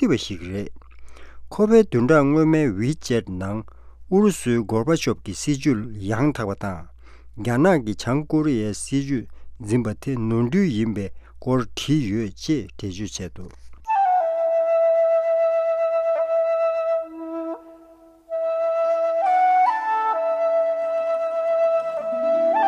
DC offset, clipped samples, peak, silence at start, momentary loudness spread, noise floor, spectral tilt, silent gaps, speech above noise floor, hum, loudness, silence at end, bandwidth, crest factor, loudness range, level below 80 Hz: under 0.1%; under 0.1%; -4 dBFS; 0 s; 13 LU; -49 dBFS; -6.5 dB/octave; none; 28 dB; none; -22 LUFS; 0 s; 13.5 kHz; 18 dB; 4 LU; -48 dBFS